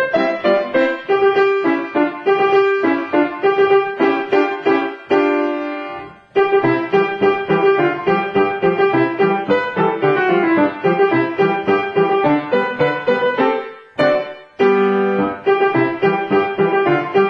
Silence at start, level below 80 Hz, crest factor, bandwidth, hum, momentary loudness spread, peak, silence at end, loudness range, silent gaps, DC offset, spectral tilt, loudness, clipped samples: 0 s; -60 dBFS; 14 dB; 6.2 kHz; none; 4 LU; -2 dBFS; 0 s; 1 LU; none; under 0.1%; -7.5 dB/octave; -16 LUFS; under 0.1%